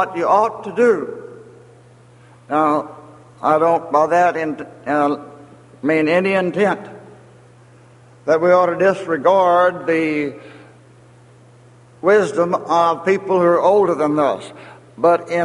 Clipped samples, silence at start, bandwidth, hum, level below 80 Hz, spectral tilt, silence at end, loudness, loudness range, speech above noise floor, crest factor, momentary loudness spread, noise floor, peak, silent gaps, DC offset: under 0.1%; 0 s; 11.5 kHz; none; -64 dBFS; -6.5 dB/octave; 0 s; -17 LUFS; 4 LU; 30 dB; 16 dB; 13 LU; -46 dBFS; -2 dBFS; none; under 0.1%